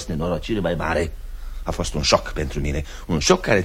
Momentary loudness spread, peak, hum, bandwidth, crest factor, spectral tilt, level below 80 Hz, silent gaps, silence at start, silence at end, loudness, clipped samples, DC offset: 11 LU; 0 dBFS; none; 16.5 kHz; 22 dB; -4.5 dB/octave; -30 dBFS; none; 0 s; 0 s; -23 LUFS; under 0.1%; under 0.1%